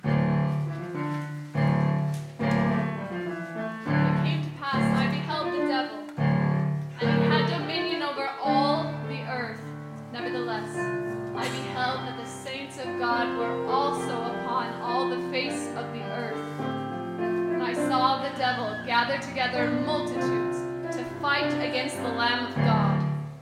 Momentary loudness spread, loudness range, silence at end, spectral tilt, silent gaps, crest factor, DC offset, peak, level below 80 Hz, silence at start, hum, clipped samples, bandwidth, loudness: 9 LU; 4 LU; 0 s; -6.5 dB/octave; none; 18 dB; under 0.1%; -10 dBFS; -60 dBFS; 0.05 s; none; under 0.1%; 12.5 kHz; -27 LUFS